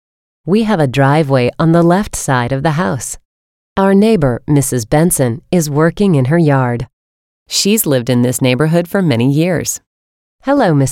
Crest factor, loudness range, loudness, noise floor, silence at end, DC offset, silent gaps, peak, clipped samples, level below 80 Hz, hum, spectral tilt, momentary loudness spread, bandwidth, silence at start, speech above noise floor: 12 dB; 1 LU; -13 LUFS; under -90 dBFS; 0 s; under 0.1%; 3.25-3.76 s, 6.93-7.46 s, 9.86-10.39 s; 0 dBFS; under 0.1%; -40 dBFS; none; -5.5 dB/octave; 8 LU; 17 kHz; 0.45 s; over 78 dB